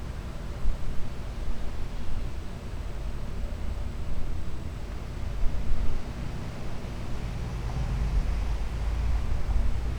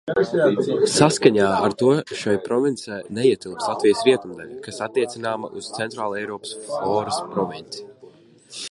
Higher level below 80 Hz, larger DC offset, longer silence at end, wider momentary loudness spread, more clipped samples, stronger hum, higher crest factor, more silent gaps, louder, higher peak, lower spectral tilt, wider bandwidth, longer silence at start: first, -30 dBFS vs -60 dBFS; neither; about the same, 0 s vs 0 s; second, 8 LU vs 16 LU; neither; neither; second, 16 dB vs 22 dB; neither; second, -35 LUFS vs -21 LUFS; second, -10 dBFS vs 0 dBFS; first, -6.5 dB/octave vs -4.5 dB/octave; second, 8.6 kHz vs 11.5 kHz; about the same, 0 s vs 0.05 s